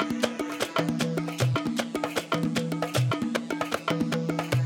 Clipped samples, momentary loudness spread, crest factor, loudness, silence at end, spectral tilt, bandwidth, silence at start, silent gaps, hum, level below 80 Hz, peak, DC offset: under 0.1%; 3 LU; 20 dB; -28 LUFS; 0 s; -5.5 dB/octave; 19 kHz; 0 s; none; none; -60 dBFS; -8 dBFS; under 0.1%